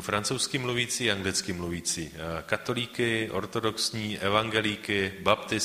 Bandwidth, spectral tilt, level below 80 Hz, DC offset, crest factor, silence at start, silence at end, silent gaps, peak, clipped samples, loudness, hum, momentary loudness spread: 15.5 kHz; -3 dB/octave; -56 dBFS; under 0.1%; 22 dB; 0 s; 0 s; none; -6 dBFS; under 0.1%; -28 LUFS; none; 5 LU